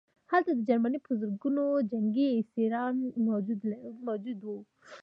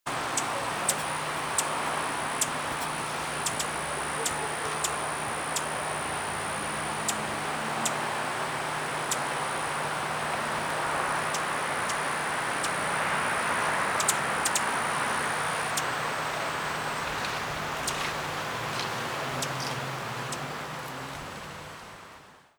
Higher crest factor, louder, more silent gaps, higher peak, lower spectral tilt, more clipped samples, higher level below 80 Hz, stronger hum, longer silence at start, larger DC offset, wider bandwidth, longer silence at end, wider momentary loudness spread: about the same, 18 dB vs 22 dB; about the same, -31 LUFS vs -29 LUFS; neither; about the same, -12 dBFS vs -10 dBFS; first, -9 dB/octave vs -2 dB/octave; neither; second, -84 dBFS vs -58 dBFS; neither; first, 0.3 s vs 0.05 s; neither; second, 5.6 kHz vs over 20 kHz; second, 0 s vs 0.2 s; first, 10 LU vs 7 LU